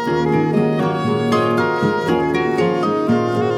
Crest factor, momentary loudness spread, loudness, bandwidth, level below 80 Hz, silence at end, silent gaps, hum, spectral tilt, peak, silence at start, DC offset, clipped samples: 12 dB; 2 LU; -17 LUFS; 13 kHz; -50 dBFS; 0 s; none; none; -7 dB/octave; -4 dBFS; 0 s; under 0.1%; under 0.1%